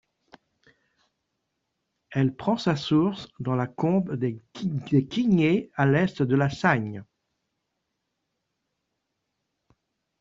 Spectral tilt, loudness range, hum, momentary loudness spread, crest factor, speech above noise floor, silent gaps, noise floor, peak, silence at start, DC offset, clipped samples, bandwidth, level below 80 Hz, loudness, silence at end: -7.5 dB/octave; 5 LU; none; 9 LU; 22 dB; 56 dB; none; -80 dBFS; -6 dBFS; 2.1 s; under 0.1%; under 0.1%; 7.6 kHz; -62 dBFS; -25 LUFS; 3.15 s